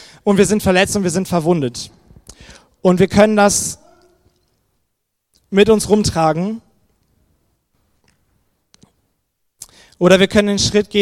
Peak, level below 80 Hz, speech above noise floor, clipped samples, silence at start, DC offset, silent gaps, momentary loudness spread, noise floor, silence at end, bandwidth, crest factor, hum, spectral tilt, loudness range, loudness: 0 dBFS; -42 dBFS; 58 dB; under 0.1%; 0.25 s; under 0.1%; none; 12 LU; -72 dBFS; 0 s; 16 kHz; 18 dB; none; -4.5 dB/octave; 6 LU; -14 LUFS